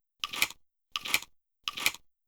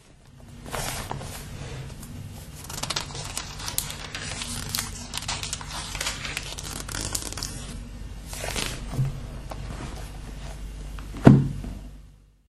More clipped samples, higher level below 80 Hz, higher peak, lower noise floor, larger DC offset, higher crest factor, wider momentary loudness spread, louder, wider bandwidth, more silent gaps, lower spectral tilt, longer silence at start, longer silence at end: neither; second, -66 dBFS vs -40 dBFS; second, -8 dBFS vs 0 dBFS; about the same, -51 dBFS vs -50 dBFS; neither; about the same, 28 dB vs 28 dB; about the same, 11 LU vs 11 LU; second, -32 LUFS vs -28 LUFS; first, over 20 kHz vs 13.5 kHz; neither; second, 1 dB/octave vs -4.5 dB/octave; first, 0.25 s vs 0.05 s; about the same, 0.3 s vs 0.25 s